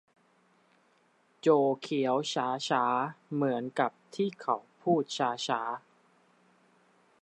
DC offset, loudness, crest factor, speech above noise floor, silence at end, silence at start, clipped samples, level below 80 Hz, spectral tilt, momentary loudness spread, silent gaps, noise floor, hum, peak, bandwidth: under 0.1%; -30 LUFS; 20 dB; 38 dB; 1.45 s; 1.45 s; under 0.1%; -84 dBFS; -5 dB/octave; 7 LU; none; -68 dBFS; none; -12 dBFS; 11 kHz